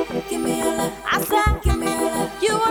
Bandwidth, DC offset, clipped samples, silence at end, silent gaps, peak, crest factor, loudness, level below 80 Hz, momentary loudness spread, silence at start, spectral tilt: 19.5 kHz; under 0.1%; under 0.1%; 0 s; none; -6 dBFS; 16 dB; -21 LUFS; -28 dBFS; 5 LU; 0 s; -4.5 dB/octave